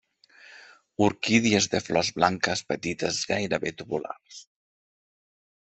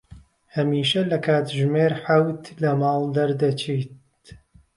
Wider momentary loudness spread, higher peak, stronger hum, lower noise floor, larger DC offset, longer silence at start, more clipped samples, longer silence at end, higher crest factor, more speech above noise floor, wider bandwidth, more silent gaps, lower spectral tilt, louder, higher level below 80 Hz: first, 18 LU vs 7 LU; about the same, -6 dBFS vs -6 dBFS; neither; first, -54 dBFS vs -49 dBFS; neither; first, 0.5 s vs 0.1 s; neither; first, 1.35 s vs 0.4 s; first, 22 dB vs 16 dB; about the same, 28 dB vs 28 dB; second, 8.4 kHz vs 11.5 kHz; neither; second, -3.5 dB/octave vs -6.5 dB/octave; second, -25 LUFS vs -22 LUFS; about the same, -62 dBFS vs -58 dBFS